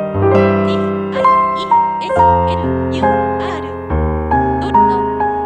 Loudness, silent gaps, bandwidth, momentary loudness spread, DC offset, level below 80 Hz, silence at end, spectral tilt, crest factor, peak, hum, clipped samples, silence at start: -14 LUFS; none; 9.4 kHz; 6 LU; under 0.1%; -30 dBFS; 0 s; -8 dB/octave; 12 dB; -2 dBFS; none; under 0.1%; 0 s